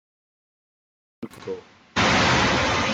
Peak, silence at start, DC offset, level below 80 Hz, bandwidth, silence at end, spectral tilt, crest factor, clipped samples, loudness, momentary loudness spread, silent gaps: -8 dBFS; 1.2 s; under 0.1%; -44 dBFS; 14 kHz; 0 s; -3.5 dB/octave; 18 dB; under 0.1%; -20 LUFS; 21 LU; none